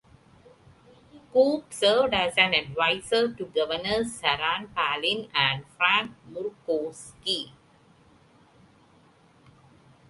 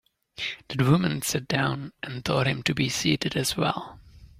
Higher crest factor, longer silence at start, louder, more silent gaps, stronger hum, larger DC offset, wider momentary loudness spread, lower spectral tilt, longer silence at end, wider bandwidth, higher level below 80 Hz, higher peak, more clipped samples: about the same, 24 dB vs 20 dB; first, 1.15 s vs 0.4 s; about the same, -25 LUFS vs -26 LUFS; neither; neither; neither; about the same, 11 LU vs 12 LU; second, -3 dB/octave vs -4.5 dB/octave; first, 2.6 s vs 0.1 s; second, 11.5 kHz vs 16 kHz; second, -60 dBFS vs -54 dBFS; first, -4 dBFS vs -8 dBFS; neither